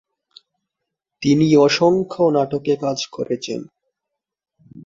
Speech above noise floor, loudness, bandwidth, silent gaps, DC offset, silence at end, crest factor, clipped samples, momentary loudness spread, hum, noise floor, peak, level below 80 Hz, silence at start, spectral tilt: 65 dB; -18 LUFS; 7.6 kHz; none; under 0.1%; 0.05 s; 16 dB; under 0.1%; 12 LU; none; -82 dBFS; -4 dBFS; -58 dBFS; 1.2 s; -5.5 dB/octave